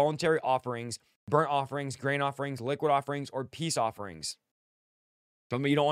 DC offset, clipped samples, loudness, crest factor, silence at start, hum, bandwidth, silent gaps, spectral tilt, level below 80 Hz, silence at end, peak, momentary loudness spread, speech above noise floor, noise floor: under 0.1%; under 0.1%; -31 LUFS; 20 dB; 0 s; none; 15 kHz; 1.16-1.27 s, 4.51-5.50 s; -5 dB/octave; -72 dBFS; 0 s; -10 dBFS; 11 LU; over 60 dB; under -90 dBFS